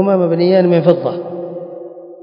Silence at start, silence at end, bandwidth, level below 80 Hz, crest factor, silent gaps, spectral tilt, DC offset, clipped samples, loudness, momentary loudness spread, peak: 0 s; 0.05 s; 5.4 kHz; -64 dBFS; 14 dB; none; -10.5 dB/octave; under 0.1%; under 0.1%; -13 LUFS; 19 LU; 0 dBFS